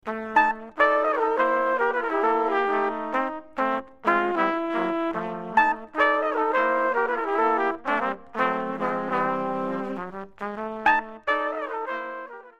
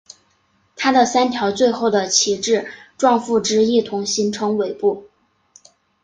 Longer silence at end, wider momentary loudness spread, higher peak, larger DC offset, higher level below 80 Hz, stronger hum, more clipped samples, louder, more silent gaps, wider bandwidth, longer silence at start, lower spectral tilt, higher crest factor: second, 0.1 s vs 1 s; first, 9 LU vs 6 LU; second, -6 dBFS vs -2 dBFS; first, 0.3% vs under 0.1%; about the same, -60 dBFS vs -62 dBFS; neither; neither; second, -24 LUFS vs -18 LUFS; neither; about the same, 9.2 kHz vs 10 kHz; second, 0.05 s vs 0.8 s; first, -6 dB/octave vs -3 dB/octave; about the same, 20 dB vs 18 dB